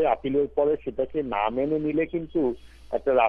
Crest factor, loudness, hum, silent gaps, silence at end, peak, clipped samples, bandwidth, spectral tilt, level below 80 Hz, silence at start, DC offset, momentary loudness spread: 16 dB; -26 LUFS; none; none; 0 s; -8 dBFS; under 0.1%; 4.9 kHz; -8.5 dB/octave; -50 dBFS; 0 s; under 0.1%; 5 LU